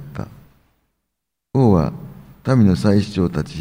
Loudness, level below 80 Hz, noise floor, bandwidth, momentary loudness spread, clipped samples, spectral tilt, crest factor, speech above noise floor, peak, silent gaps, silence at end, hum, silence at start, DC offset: -17 LUFS; -44 dBFS; -79 dBFS; 16 kHz; 20 LU; under 0.1%; -8.5 dB/octave; 18 dB; 63 dB; -2 dBFS; none; 0 s; none; 0 s; under 0.1%